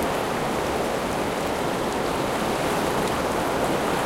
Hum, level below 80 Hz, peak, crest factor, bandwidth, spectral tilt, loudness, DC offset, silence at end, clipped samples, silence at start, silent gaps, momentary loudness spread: none; -44 dBFS; -12 dBFS; 14 dB; 16.5 kHz; -4.5 dB/octave; -25 LUFS; under 0.1%; 0 s; under 0.1%; 0 s; none; 2 LU